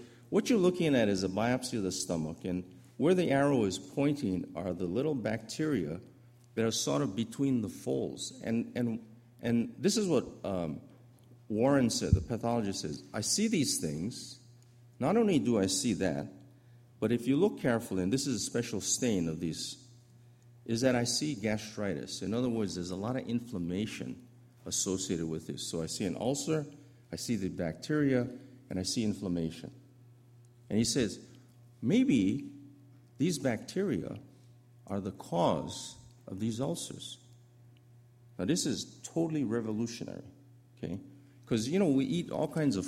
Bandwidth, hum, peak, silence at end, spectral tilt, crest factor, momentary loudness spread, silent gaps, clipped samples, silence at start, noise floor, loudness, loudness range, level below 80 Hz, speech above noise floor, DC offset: 16 kHz; none; -12 dBFS; 0 s; -5 dB/octave; 22 dB; 13 LU; none; under 0.1%; 0 s; -59 dBFS; -32 LUFS; 5 LU; -56 dBFS; 27 dB; under 0.1%